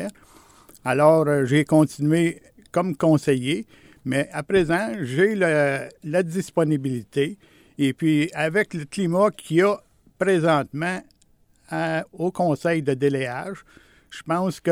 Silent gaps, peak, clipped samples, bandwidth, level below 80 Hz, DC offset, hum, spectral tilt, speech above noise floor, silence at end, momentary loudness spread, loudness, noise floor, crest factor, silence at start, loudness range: none; -4 dBFS; under 0.1%; 16 kHz; -58 dBFS; under 0.1%; none; -6.5 dB/octave; 38 dB; 0 s; 10 LU; -22 LUFS; -59 dBFS; 18 dB; 0 s; 4 LU